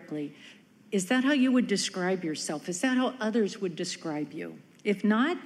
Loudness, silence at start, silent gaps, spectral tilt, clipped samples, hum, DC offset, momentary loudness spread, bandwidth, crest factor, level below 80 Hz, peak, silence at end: -29 LUFS; 0 s; none; -4.5 dB/octave; under 0.1%; none; under 0.1%; 13 LU; 13 kHz; 16 dB; -82 dBFS; -14 dBFS; 0 s